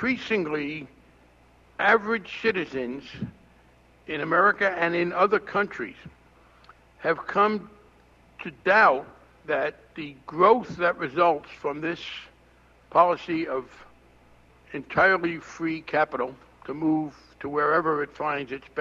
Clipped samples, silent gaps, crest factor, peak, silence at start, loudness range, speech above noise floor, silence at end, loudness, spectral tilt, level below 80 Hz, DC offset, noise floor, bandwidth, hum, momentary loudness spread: under 0.1%; none; 20 dB; -6 dBFS; 0 s; 4 LU; 32 dB; 0 s; -25 LUFS; -6 dB/octave; -60 dBFS; under 0.1%; -57 dBFS; 7.6 kHz; none; 18 LU